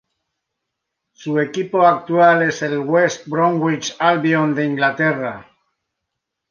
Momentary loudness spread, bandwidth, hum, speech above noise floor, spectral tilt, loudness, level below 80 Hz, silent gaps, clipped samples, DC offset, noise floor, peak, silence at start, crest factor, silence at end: 9 LU; 7.2 kHz; none; 62 dB; -5.5 dB/octave; -17 LUFS; -66 dBFS; none; under 0.1%; under 0.1%; -79 dBFS; -2 dBFS; 1.2 s; 16 dB; 1.1 s